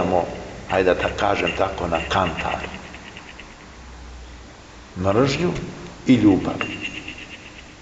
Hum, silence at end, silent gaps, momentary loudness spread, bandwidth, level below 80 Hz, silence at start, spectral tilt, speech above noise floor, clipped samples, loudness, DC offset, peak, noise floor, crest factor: none; 0 s; none; 22 LU; 8 kHz; -42 dBFS; 0 s; -6 dB/octave; 22 dB; under 0.1%; -21 LUFS; under 0.1%; -4 dBFS; -42 dBFS; 18 dB